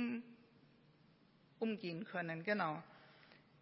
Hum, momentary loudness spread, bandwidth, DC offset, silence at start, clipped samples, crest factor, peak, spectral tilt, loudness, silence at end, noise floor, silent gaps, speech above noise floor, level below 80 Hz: none; 24 LU; 5.6 kHz; under 0.1%; 0 s; under 0.1%; 20 dB; -24 dBFS; -4.5 dB/octave; -42 LUFS; 0.25 s; -70 dBFS; none; 27 dB; -90 dBFS